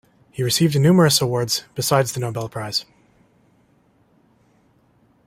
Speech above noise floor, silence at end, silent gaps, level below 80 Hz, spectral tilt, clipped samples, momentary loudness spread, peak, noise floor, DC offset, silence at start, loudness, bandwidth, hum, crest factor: 40 dB; 2.45 s; none; -58 dBFS; -4.5 dB/octave; under 0.1%; 12 LU; -2 dBFS; -59 dBFS; under 0.1%; 0.35 s; -19 LUFS; 16 kHz; none; 20 dB